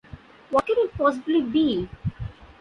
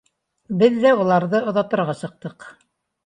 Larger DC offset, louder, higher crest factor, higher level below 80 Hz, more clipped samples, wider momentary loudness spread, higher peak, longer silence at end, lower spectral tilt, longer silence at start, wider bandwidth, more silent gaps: neither; second, -24 LUFS vs -19 LUFS; about the same, 16 dB vs 18 dB; first, -46 dBFS vs -66 dBFS; neither; second, 11 LU vs 17 LU; second, -8 dBFS vs -2 dBFS; second, 0.15 s vs 0.55 s; about the same, -7.5 dB/octave vs -7.5 dB/octave; second, 0.15 s vs 0.5 s; about the same, 10.5 kHz vs 10.5 kHz; neither